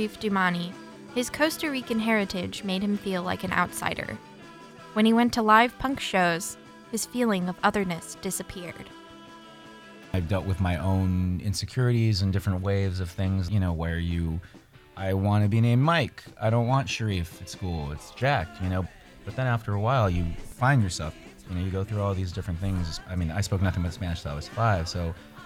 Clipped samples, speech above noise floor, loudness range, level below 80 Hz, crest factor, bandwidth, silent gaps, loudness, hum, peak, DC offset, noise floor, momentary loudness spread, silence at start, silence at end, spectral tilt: under 0.1%; 21 dB; 5 LU; -44 dBFS; 22 dB; 16 kHz; none; -27 LUFS; none; -6 dBFS; under 0.1%; -47 dBFS; 15 LU; 0 s; 0 s; -5.5 dB/octave